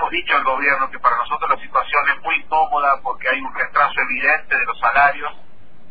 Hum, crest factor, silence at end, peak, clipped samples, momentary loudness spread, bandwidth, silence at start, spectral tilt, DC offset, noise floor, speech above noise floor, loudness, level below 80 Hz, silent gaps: none; 16 dB; 0.45 s; -2 dBFS; under 0.1%; 5 LU; 5 kHz; 0 s; -5.5 dB/octave; 3%; -50 dBFS; 32 dB; -17 LUFS; -48 dBFS; none